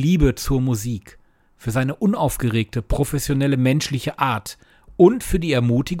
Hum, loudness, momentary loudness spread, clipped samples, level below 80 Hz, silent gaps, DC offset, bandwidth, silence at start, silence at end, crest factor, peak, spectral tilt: none; -20 LUFS; 11 LU; under 0.1%; -32 dBFS; none; under 0.1%; 17 kHz; 0 s; 0 s; 18 dB; -2 dBFS; -6 dB/octave